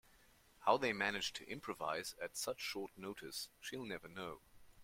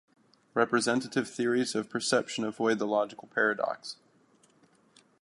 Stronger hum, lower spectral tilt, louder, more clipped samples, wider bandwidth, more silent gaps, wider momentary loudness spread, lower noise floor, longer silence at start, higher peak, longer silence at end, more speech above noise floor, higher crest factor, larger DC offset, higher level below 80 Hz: neither; about the same, -2.5 dB/octave vs -3.5 dB/octave; second, -42 LUFS vs -29 LUFS; neither; first, 16.5 kHz vs 11.5 kHz; neither; first, 14 LU vs 7 LU; about the same, -68 dBFS vs -65 dBFS; about the same, 0.6 s vs 0.55 s; second, -18 dBFS vs -10 dBFS; second, 0 s vs 1.3 s; second, 24 dB vs 35 dB; about the same, 26 dB vs 22 dB; neither; first, -72 dBFS vs -78 dBFS